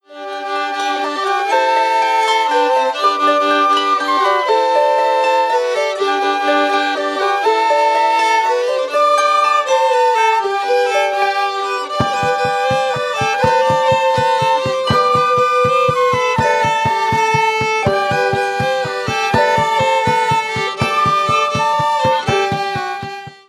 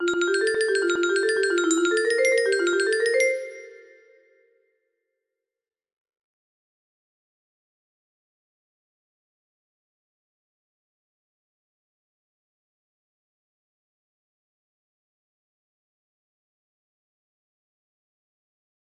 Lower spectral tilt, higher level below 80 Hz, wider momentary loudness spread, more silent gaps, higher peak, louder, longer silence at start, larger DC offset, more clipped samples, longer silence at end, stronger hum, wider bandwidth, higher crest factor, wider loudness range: first, -4 dB/octave vs -1 dB/octave; first, -50 dBFS vs -74 dBFS; about the same, 5 LU vs 3 LU; neither; first, -2 dBFS vs -8 dBFS; first, -15 LUFS vs -22 LUFS; about the same, 0.1 s vs 0 s; neither; neither; second, 0.15 s vs 15.2 s; neither; first, 13.5 kHz vs 11.5 kHz; second, 12 dB vs 20 dB; second, 2 LU vs 8 LU